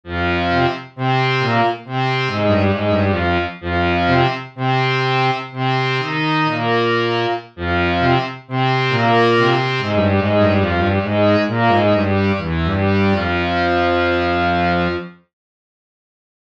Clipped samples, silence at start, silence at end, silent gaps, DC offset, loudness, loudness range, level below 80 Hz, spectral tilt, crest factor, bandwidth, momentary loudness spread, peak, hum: under 0.1%; 0.05 s; 1.3 s; none; under 0.1%; -17 LUFS; 2 LU; -40 dBFS; -7 dB/octave; 16 dB; 7.8 kHz; 5 LU; -2 dBFS; none